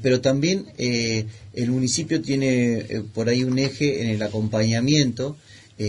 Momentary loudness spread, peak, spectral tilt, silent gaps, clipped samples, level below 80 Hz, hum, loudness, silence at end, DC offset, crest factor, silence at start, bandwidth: 8 LU; -6 dBFS; -5 dB/octave; none; under 0.1%; -54 dBFS; none; -22 LUFS; 0 s; under 0.1%; 16 dB; 0 s; 11 kHz